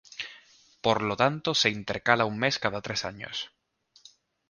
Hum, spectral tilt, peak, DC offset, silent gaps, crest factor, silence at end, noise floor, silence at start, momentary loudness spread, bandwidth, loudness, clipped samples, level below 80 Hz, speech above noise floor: none; -3.5 dB/octave; -4 dBFS; under 0.1%; none; 26 dB; 1.05 s; -59 dBFS; 0.1 s; 14 LU; 10.5 kHz; -27 LUFS; under 0.1%; -62 dBFS; 32 dB